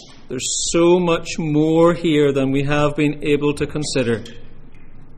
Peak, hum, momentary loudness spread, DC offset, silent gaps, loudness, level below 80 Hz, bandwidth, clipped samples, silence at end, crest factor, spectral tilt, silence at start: -4 dBFS; none; 8 LU; under 0.1%; none; -18 LUFS; -36 dBFS; 11.5 kHz; under 0.1%; 0 s; 14 dB; -5 dB/octave; 0 s